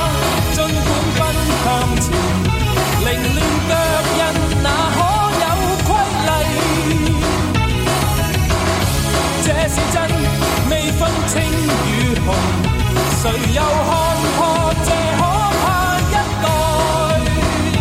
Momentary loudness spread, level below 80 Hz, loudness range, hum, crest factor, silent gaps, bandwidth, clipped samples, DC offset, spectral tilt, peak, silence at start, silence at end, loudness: 1 LU; -24 dBFS; 1 LU; none; 12 dB; none; 16.5 kHz; under 0.1%; under 0.1%; -4.5 dB/octave; -4 dBFS; 0 s; 0 s; -16 LUFS